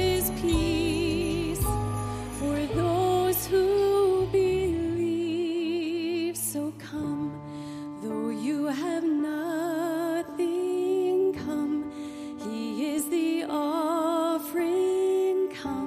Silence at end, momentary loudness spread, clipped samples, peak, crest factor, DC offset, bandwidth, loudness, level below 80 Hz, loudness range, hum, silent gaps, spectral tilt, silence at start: 0 s; 9 LU; under 0.1%; -14 dBFS; 14 dB; under 0.1%; 15.5 kHz; -27 LUFS; -44 dBFS; 5 LU; none; none; -5.5 dB/octave; 0 s